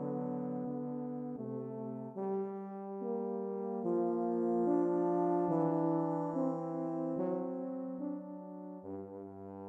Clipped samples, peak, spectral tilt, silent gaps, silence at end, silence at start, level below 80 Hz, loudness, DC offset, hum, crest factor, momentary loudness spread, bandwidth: under 0.1%; -20 dBFS; -11.5 dB/octave; none; 0 s; 0 s; -86 dBFS; -36 LUFS; under 0.1%; none; 16 dB; 14 LU; 2.7 kHz